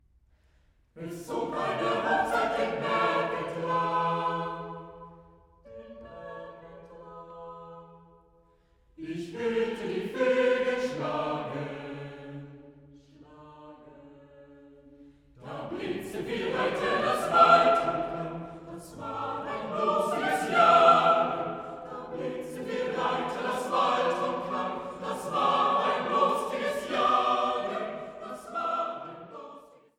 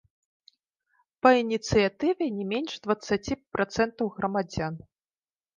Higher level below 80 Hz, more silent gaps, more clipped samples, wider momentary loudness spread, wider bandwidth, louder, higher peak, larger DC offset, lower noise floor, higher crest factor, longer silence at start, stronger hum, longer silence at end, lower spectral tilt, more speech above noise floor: second, -62 dBFS vs -52 dBFS; neither; neither; first, 20 LU vs 11 LU; first, 16.5 kHz vs 9.8 kHz; about the same, -27 LUFS vs -27 LUFS; about the same, -6 dBFS vs -4 dBFS; neither; second, -64 dBFS vs under -90 dBFS; about the same, 22 dB vs 24 dB; second, 0.95 s vs 1.25 s; neither; second, 0.3 s vs 0.8 s; about the same, -5 dB/octave vs -5.5 dB/octave; second, 36 dB vs over 64 dB